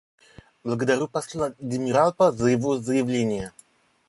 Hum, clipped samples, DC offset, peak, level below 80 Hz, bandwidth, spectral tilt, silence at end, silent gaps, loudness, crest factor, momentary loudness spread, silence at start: none; under 0.1%; under 0.1%; -6 dBFS; -56 dBFS; 11.5 kHz; -6 dB/octave; 0.6 s; none; -24 LUFS; 18 dB; 10 LU; 0.65 s